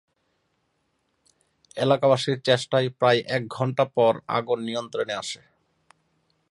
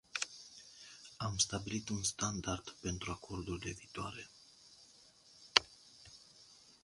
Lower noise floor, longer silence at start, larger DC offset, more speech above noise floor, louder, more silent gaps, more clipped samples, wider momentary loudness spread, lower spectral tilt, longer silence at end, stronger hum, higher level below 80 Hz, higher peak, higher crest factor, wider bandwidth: first, -72 dBFS vs -64 dBFS; first, 1.75 s vs 0.15 s; neither; first, 49 dB vs 23 dB; first, -24 LUFS vs -38 LUFS; neither; neither; second, 9 LU vs 27 LU; first, -5 dB/octave vs -2.5 dB/octave; first, 1.15 s vs 0.15 s; neither; second, -70 dBFS vs -60 dBFS; about the same, -4 dBFS vs -2 dBFS; second, 20 dB vs 40 dB; about the same, 11.5 kHz vs 11.5 kHz